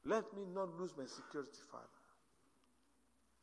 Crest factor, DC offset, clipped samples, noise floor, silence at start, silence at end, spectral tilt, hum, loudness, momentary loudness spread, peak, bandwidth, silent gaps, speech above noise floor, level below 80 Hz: 22 dB; under 0.1%; under 0.1%; -78 dBFS; 0.05 s; 1.45 s; -5 dB/octave; none; -46 LUFS; 17 LU; -26 dBFS; 11 kHz; none; 31 dB; -80 dBFS